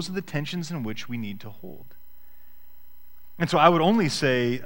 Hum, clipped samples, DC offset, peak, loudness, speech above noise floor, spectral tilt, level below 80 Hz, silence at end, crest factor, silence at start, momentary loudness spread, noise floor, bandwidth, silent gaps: none; under 0.1%; 1%; -2 dBFS; -24 LUFS; 31 dB; -5.5 dB/octave; -58 dBFS; 0 s; 24 dB; 0 s; 22 LU; -56 dBFS; 16.5 kHz; none